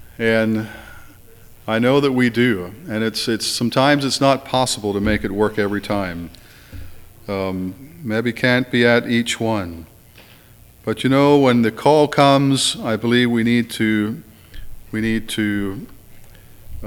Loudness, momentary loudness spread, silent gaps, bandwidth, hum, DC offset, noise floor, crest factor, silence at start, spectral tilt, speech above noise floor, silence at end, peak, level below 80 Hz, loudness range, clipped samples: -18 LUFS; 17 LU; none; 19 kHz; none; under 0.1%; -46 dBFS; 18 dB; 0 s; -5 dB/octave; 28 dB; 0 s; 0 dBFS; -44 dBFS; 7 LU; under 0.1%